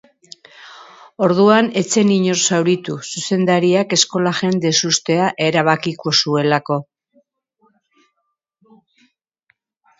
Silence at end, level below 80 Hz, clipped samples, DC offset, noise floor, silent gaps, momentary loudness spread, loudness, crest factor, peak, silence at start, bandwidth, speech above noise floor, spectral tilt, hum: 3.15 s; -64 dBFS; under 0.1%; under 0.1%; -73 dBFS; none; 6 LU; -16 LUFS; 18 dB; 0 dBFS; 0.6 s; 8 kHz; 57 dB; -4 dB/octave; none